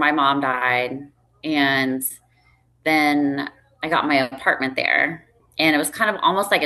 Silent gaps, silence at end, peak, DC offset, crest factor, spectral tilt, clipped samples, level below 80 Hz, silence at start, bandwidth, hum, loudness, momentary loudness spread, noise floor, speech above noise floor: none; 0 s; -4 dBFS; under 0.1%; 16 dB; -3.5 dB/octave; under 0.1%; -62 dBFS; 0 s; 13 kHz; none; -20 LUFS; 11 LU; -59 dBFS; 39 dB